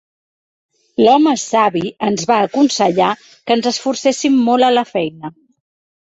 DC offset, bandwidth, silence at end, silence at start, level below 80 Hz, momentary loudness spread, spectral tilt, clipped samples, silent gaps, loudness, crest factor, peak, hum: under 0.1%; 8.2 kHz; 0.8 s; 1 s; -60 dBFS; 10 LU; -4 dB/octave; under 0.1%; none; -15 LUFS; 16 dB; 0 dBFS; none